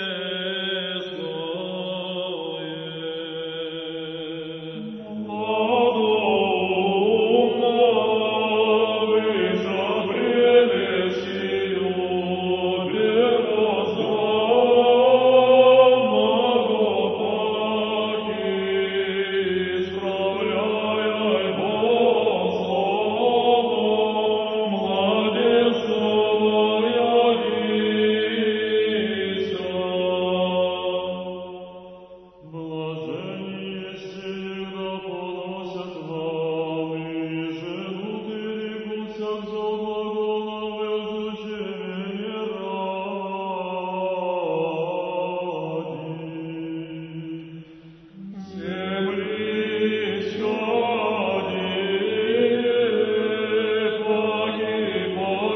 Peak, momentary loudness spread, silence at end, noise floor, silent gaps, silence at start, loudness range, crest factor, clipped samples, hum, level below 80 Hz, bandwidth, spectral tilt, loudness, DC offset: -4 dBFS; 13 LU; 0 s; -46 dBFS; none; 0 s; 12 LU; 18 dB; under 0.1%; none; -64 dBFS; 6.2 kHz; -7 dB/octave; -22 LUFS; under 0.1%